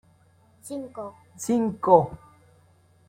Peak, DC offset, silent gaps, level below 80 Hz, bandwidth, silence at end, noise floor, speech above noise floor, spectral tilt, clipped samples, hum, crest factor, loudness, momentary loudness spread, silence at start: -4 dBFS; under 0.1%; none; -60 dBFS; 16.5 kHz; 0.9 s; -59 dBFS; 35 dB; -7 dB/octave; under 0.1%; none; 24 dB; -24 LUFS; 20 LU; 0.65 s